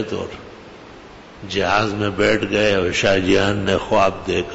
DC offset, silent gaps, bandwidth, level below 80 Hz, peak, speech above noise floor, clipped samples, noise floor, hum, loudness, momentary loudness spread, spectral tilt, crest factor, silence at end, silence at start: under 0.1%; none; 8 kHz; -42 dBFS; -4 dBFS; 22 dB; under 0.1%; -40 dBFS; none; -18 LUFS; 13 LU; -5 dB/octave; 14 dB; 0 s; 0 s